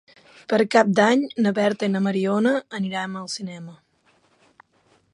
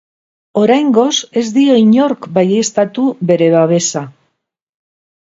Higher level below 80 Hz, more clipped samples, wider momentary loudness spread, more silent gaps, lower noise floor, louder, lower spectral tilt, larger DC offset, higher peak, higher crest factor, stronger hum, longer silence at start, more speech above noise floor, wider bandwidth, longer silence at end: second, -70 dBFS vs -60 dBFS; neither; first, 16 LU vs 7 LU; neither; about the same, -62 dBFS vs -65 dBFS; second, -21 LUFS vs -12 LUFS; about the same, -5.5 dB/octave vs -5 dB/octave; neither; about the same, -2 dBFS vs 0 dBFS; first, 20 dB vs 12 dB; neither; about the same, 0.5 s vs 0.55 s; second, 41 dB vs 54 dB; first, 11 kHz vs 7.8 kHz; about the same, 1.4 s vs 1.3 s